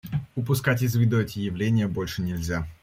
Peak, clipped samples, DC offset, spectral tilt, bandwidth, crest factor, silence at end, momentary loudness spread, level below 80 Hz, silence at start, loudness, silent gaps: -10 dBFS; under 0.1%; under 0.1%; -6.5 dB/octave; 16 kHz; 16 dB; 0.1 s; 7 LU; -48 dBFS; 0.05 s; -25 LUFS; none